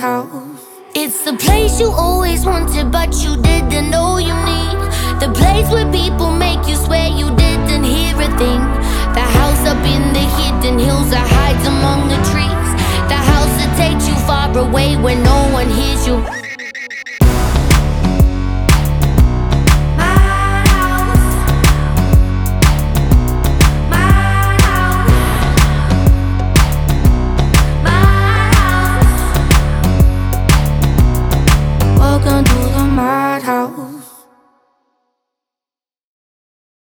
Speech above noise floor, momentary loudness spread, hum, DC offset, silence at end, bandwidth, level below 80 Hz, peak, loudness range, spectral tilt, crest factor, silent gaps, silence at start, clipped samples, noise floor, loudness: over 78 dB; 5 LU; none; under 0.1%; 2.8 s; over 20 kHz; -16 dBFS; 0 dBFS; 3 LU; -5.5 dB/octave; 12 dB; none; 0 s; under 0.1%; under -90 dBFS; -13 LUFS